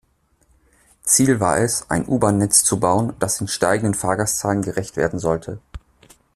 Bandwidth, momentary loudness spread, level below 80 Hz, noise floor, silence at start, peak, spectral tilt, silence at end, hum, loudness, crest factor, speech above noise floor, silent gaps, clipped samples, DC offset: 15.5 kHz; 9 LU; -46 dBFS; -61 dBFS; 1.05 s; 0 dBFS; -4 dB/octave; 0.55 s; none; -19 LUFS; 20 dB; 42 dB; none; under 0.1%; under 0.1%